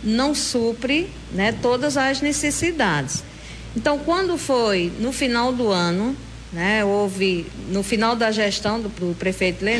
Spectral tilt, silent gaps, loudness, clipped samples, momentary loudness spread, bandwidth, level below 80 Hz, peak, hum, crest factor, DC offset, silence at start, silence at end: -4 dB/octave; none; -21 LUFS; under 0.1%; 7 LU; 11 kHz; -42 dBFS; -8 dBFS; none; 14 dB; under 0.1%; 0 s; 0 s